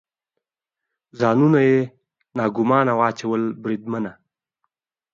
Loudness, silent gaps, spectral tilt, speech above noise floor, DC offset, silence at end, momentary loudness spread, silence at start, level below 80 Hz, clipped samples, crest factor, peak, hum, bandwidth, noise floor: -20 LUFS; none; -8 dB/octave; 66 dB; under 0.1%; 1 s; 13 LU; 1.15 s; -66 dBFS; under 0.1%; 18 dB; -4 dBFS; none; 7.6 kHz; -85 dBFS